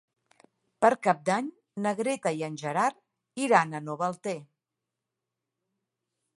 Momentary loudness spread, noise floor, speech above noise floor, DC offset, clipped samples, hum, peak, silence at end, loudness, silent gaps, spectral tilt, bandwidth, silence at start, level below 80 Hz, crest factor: 12 LU; -87 dBFS; 60 dB; under 0.1%; under 0.1%; none; -6 dBFS; 1.9 s; -28 LUFS; none; -5 dB/octave; 11.5 kHz; 0.8 s; -80 dBFS; 24 dB